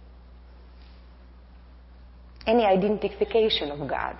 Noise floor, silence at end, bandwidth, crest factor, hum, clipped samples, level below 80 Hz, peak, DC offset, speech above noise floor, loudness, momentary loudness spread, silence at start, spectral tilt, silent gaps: -48 dBFS; 0 s; 5.8 kHz; 18 dB; 60 Hz at -50 dBFS; under 0.1%; -48 dBFS; -10 dBFS; under 0.1%; 25 dB; -24 LUFS; 9 LU; 0 s; -9.5 dB/octave; none